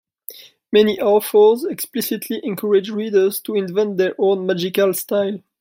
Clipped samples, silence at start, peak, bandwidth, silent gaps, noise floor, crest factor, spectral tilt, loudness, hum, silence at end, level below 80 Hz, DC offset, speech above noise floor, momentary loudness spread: under 0.1%; 0.3 s; -2 dBFS; 16.5 kHz; none; -40 dBFS; 16 dB; -5 dB/octave; -18 LUFS; none; 0.2 s; -68 dBFS; under 0.1%; 22 dB; 10 LU